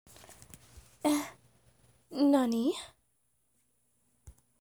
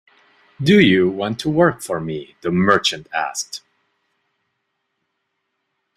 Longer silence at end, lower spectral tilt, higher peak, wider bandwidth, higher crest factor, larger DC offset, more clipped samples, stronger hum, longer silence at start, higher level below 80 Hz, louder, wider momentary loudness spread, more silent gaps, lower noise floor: second, 0.3 s vs 2.4 s; about the same, -4 dB/octave vs -5 dB/octave; second, -16 dBFS vs -2 dBFS; first, over 20 kHz vs 14.5 kHz; about the same, 20 dB vs 18 dB; neither; neither; neither; second, 0.3 s vs 0.6 s; second, -66 dBFS vs -54 dBFS; second, -30 LUFS vs -18 LUFS; first, 26 LU vs 14 LU; neither; about the same, -76 dBFS vs -74 dBFS